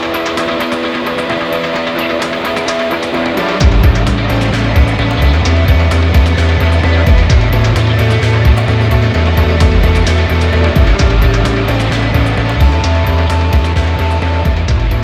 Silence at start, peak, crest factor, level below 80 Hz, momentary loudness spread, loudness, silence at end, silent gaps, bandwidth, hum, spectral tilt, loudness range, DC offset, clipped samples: 0 s; 0 dBFS; 10 dB; -14 dBFS; 5 LU; -12 LUFS; 0 s; none; 14.5 kHz; none; -6.5 dB/octave; 3 LU; under 0.1%; under 0.1%